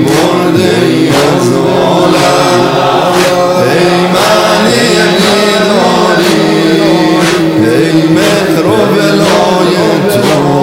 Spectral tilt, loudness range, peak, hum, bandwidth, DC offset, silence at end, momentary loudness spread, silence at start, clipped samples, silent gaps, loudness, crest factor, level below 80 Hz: -5 dB/octave; 1 LU; 0 dBFS; none; 16.5 kHz; 0.3%; 0 s; 2 LU; 0 s; 3%; none; -7 LUFS; 8 dB; -42 dBFS